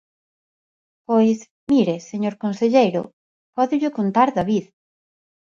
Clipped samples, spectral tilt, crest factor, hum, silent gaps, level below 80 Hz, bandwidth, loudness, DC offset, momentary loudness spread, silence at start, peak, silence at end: under 0.1%; -7 dB/octave; 18 dB; none; 1.51-1.67 s, 3.13-3.53 s; -60 dBFS; 7.4 kHz; -20 LUFS; under 0.1%; 9 LU; 1.1 s; -2 dBFS; 0.95 s